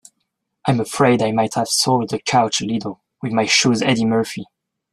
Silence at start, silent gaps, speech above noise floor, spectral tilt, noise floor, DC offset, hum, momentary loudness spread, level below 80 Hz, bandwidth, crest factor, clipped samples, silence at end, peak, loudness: 0.65 s; none; 56 dB; -4 dB/octave; -74 dBFS; under 0.1%; none; 11 LU; -58 dBFS; 14 kHz; 18 dB; under 0.1%; 0.5 s; -2 dBFS; -18 LUFS